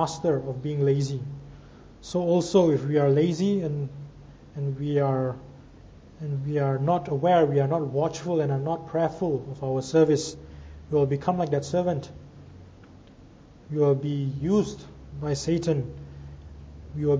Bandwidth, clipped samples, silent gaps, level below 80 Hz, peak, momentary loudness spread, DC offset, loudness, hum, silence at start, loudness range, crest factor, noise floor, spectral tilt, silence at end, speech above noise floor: 8 kHz; under 0.1%; none; -52 dBFS; -8 dBFS; 21 LU; under 0.1%; -26 LUFS; none; 0 s; 5 LU; 18 dB; -50 dBFS; -7 dB/octave; 0 s; 25 dB